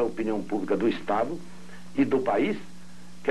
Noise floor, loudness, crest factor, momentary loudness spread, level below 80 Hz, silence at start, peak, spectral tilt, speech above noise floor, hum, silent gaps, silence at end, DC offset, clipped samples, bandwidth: -48 dBFS; -27 LUFS; 14 dB; 21 LU; -60 dBFS; 0 s; -12 dBFS; -6.5 dB/octave; 22 dB; 60 Hz at -45 dBFS; none; 0 s; 1%; under 0.1%; 12 kHz